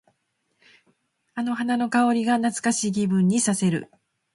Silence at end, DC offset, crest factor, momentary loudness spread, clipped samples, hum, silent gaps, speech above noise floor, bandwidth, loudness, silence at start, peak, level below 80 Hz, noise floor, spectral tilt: 0.5 s; under 0.1%; 16 dB; 8 LU; under 0.1%; none; none; 51 dB; 11.5 kHz; -23 LUFS; 1.35 s; -8 dBFS; -68 dBFS; -73 dBFS; -5 dB/octave